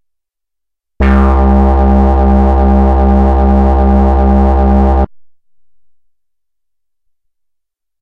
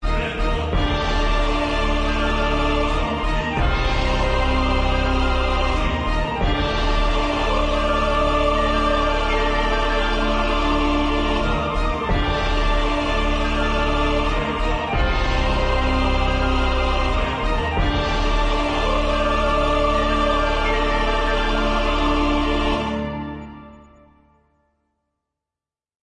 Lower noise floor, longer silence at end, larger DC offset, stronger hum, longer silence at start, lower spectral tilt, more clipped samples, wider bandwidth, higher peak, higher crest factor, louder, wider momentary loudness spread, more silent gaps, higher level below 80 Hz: second, -81 dBFS vs under -90 dBFS; first, 2.8 s vs 2.3 s; second, under 0.1% vs 0.2%; neither; first, 1 s vs 0 s; first, -10.5 dB/octave vs -5.5 dB/octave; neither; second, 3.9 kHz vs 9.4 kHz; first, 0 dBFS vs -6 dBFS; about the same, 10 dB vs 12 dB; first, -10 LUFS vs -21 LUFS; about the same, 2 LU vs 3 LU; neither; first, -12 dBFS vs -24 dBFS